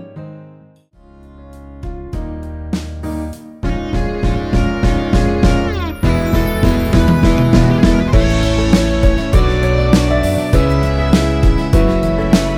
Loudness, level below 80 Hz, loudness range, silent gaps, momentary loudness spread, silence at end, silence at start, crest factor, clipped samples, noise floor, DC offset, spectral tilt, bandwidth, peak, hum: -15 LUFS; -18 dBFS; 13 LU; none; 14 LU; 0 s; 0 s; 14 dB; under 0.1%; -45 dBFS; under 0.1%; -7 dB/octave; 16.5 kHz; 0 dBFS; none